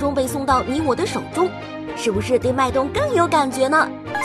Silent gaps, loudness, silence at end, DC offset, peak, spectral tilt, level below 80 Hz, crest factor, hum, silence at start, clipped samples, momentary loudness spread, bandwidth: none; -20 LUFS; 0 s; under 0.1%; -4 dBFS; -5 dB/octave; -44 dBFS; 16 dB; none; 0 s; under 0.1%; 6 LU; 15.5 kHz